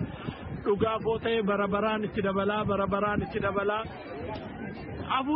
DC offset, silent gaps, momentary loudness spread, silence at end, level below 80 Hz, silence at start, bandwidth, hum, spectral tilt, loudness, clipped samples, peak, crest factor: under 0.1%; none; 11 LU; 0 s; -50 dBFS; 0 s; 5.2 kHz; none; -4.5 dB/octave; -30 LUFS; under 0.1%; -14 dBFS; 16 dB